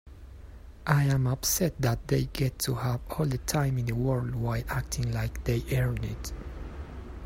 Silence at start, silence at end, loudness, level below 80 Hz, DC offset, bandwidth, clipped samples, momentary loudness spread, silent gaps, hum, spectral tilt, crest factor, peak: 0.05 s; 0 s; -29 LUFS; -42 dBFS; under 0.1%; 16.5 kHz; under 0.1%; 16 LU; none; none; -5.5 dB/octave; 22 dB; -8 dBFS